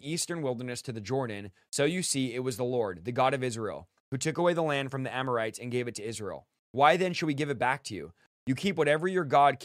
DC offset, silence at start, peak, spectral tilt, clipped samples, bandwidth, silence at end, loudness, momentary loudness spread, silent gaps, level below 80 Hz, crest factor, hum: under 0.1%; 0.05 s; -6 dBFS; -4.5 dB/octave; under 0.1%; 15.5 kHz; 0 s; -30 LUFS; 14 LU; 4.00-4.12 s, 6.59-6.74 s, 8.26-8.47 s; -68 dBFS; 22 dB; none